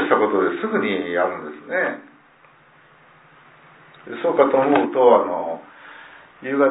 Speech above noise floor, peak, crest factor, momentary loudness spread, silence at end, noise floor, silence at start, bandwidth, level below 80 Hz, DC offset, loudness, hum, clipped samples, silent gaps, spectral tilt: 33 dB; -2 dBFS; 20 dB; 21 LU; 0 s; -52 dBFS; 0 s; 4 kHz; -70 dBFS; under 0.1%; -19 LUFS; none; under 0.1%; none; -9.5 dB/octave